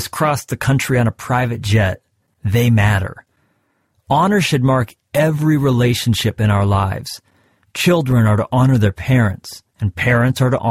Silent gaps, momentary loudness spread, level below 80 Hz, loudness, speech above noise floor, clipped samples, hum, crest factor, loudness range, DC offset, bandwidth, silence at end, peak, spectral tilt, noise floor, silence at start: none; 10 LU; -40 dBFS; -16 LUFS; 49 dB; under 0.1%; none; 14 dB; 2 LU; under 0.1%; 16 kHz; 0 s; -2 dBFS; -6 dB/octave; -64 dBFS; 0 s